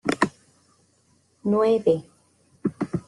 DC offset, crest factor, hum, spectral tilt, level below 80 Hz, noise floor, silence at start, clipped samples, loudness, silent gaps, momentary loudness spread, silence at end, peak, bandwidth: under 0.1%; 22 dB; none; -6.5 dB/octave; -62 dBFS; -64 dBFS; 0.05 s; under 0.1%; -24 LUFS; none; 11 LU; 0.1 s; -4 dBFS; 11.5 kHz